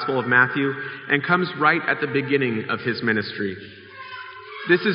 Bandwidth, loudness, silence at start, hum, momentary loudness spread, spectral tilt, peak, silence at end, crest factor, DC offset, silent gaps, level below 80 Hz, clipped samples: 5.4 kHz; -21 LUFS; 0 s; none; 19 LU; -3.5 dB/octave; -4 dBFS; 0 s; 20 dB; under 0.1%; none; -68 dBFS; under 0.1%